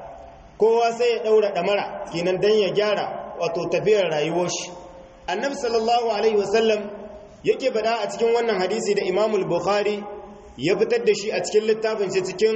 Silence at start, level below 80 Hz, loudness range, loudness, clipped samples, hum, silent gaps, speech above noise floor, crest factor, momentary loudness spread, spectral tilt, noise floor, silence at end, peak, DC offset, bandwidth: 0 s; -56 dBFS; 2 LU; -22 LUFS; under 0.1%; none; none; 21 dB; 14 dB; 10 LU; -4 dB/octave; -42 dBFS; 0 s; -8 dBFS; under 0.1%; 8.4 kHz